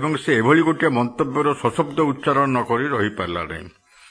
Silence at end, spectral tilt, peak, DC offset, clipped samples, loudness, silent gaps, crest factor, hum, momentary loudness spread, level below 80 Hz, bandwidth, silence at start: 0.4 s; -6.5 dB/octave; -4 dBFS; under 0.1%; under 0.1%; -20 LUFS; none; 16 dB; none; 10 LU; -54 dBFS; 10.5 kHz; 0 s